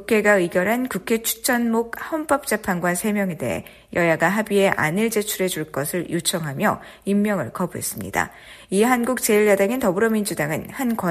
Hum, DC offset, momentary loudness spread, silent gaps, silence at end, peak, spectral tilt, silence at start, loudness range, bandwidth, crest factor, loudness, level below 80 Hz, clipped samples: none; under 0.1%; 8 LU; none; 0 s; -2 dBFS; -4.5 dB/octave; 0 s; 3 LU; 15.5 kHz; 20 dB; -21 LUFS; -54 dBFS; under 0.1%